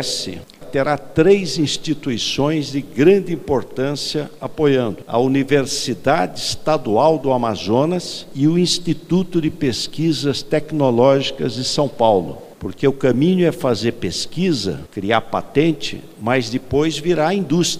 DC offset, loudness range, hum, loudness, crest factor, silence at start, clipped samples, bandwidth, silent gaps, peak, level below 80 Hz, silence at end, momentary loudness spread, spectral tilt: under 0.1%; 2 LU; none; -18 LUFS; 18 dB; 0 s; under 0.1%; 15.5 kHz; none; 0 dBFS; -46 dBFS; 0 s; 9 LU; -5 dB/octave